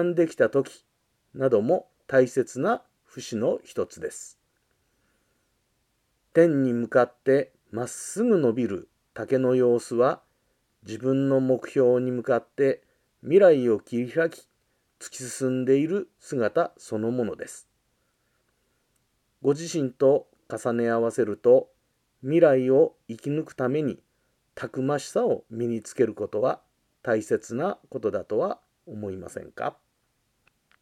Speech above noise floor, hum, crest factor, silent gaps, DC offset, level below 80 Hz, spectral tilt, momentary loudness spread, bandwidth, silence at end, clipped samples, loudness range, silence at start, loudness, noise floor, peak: 48 dB; none; 20 dB; none; under 0.1%; -72 dBFS; -6.5 dB/octave; 16 LU; 14 kHz; 1.1 s; under 0.1%; 8 LU; 0 s; -25 LUFS; -72 dBFS; -6 dBFS